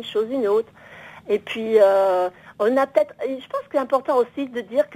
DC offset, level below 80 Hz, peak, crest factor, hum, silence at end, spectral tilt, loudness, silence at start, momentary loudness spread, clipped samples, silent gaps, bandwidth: under 0.1%; -68 dBFS; -4 dBFS; 18 dB; none; 0 s; -5 dB/octave; -21 LUFS; 0 s; 13 LU; under 0.1%; none; 16 kHz